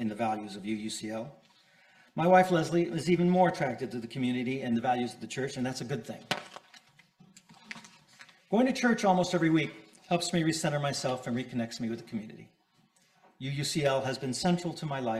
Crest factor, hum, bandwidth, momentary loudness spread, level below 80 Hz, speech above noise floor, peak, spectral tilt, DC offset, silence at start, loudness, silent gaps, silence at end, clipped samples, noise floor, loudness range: 22 dB; none; 14.5 kHz; 15 LU; -66 dBFS; 38 dB; -8 dBFS; -5.5 dB/octave; under 0.1%; 0 s; -30 LUFS; none; 0 s; under 0.1%; -68 dBFS; 7 LU